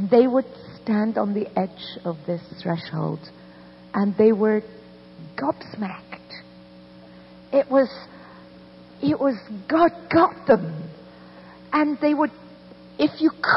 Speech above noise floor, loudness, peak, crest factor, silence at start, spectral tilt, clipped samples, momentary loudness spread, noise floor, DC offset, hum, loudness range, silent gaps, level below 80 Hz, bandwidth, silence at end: 24 dB; -23 LUFS; -6 dBFS; 18 dB; 0 s; -10 dB/octave; under 0.1%; 21 LU; -46 dBFS; under 0.1%; none; 5 LU; none; -62 dBFS; 5.8 kHz; 0 s